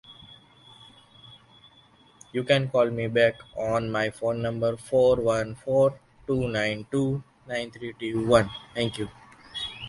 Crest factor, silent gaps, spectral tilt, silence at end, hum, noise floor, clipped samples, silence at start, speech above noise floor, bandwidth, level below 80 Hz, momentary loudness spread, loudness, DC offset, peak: 22 dB; none; -6 dB/octave; 0 s; none; -57 dBFS; under 0.1%; 0.1 s; 32 dB; 11.5 kHz; -54 dBFS; 13 LU; -26 LUFS; under 0.1%; -6 dBFS